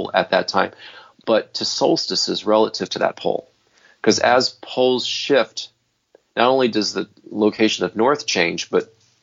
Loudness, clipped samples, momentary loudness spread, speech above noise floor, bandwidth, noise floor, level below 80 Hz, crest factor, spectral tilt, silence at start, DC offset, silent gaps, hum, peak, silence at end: -19 LUFS; under 0.1%; 11 LU; 39 dB; 7.6 kHz; -58 dBFS; -68 dBFS; 20 dB; -3.5 dB/octave; 0 s; under 0.1%; none; none; 0 dBFS; 0.4 s